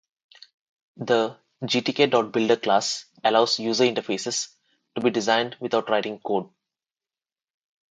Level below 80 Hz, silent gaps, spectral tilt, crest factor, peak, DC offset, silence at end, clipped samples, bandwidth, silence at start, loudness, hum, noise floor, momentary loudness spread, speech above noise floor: -74 dBFS; none; -3.5 dB/octave; 20 dB; -4 dBFS; under 0.1%; 1.45 s; under 0.1%; 9.6 kHz; 1 s; -23 LUFS; none; under -90 dBFS; 8 LU; over 67 dB